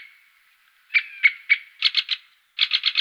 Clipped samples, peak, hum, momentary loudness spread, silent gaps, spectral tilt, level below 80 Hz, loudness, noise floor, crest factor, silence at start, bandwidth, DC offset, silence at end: under 0.1%; -4 dBFS; none; 10 LU; none; 7.5 dB/octave; -88 dBFS; -21 LUFS; -60 dBFS; 20 dB; 0 s; 15 kHz; under 0.1%; 0 s